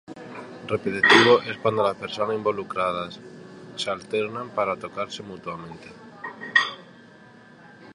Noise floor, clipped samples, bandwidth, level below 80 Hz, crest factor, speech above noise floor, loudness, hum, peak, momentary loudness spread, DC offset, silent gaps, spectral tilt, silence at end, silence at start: -49 dBFS; under 0.1%; 11 kHz; -64 dBFS; 24 dB; 25 dB; -23 LUFS; none; -2 dBFS; 23 LU; under 0.1%; none; -4 dB/octave; 0 s; 0.1 s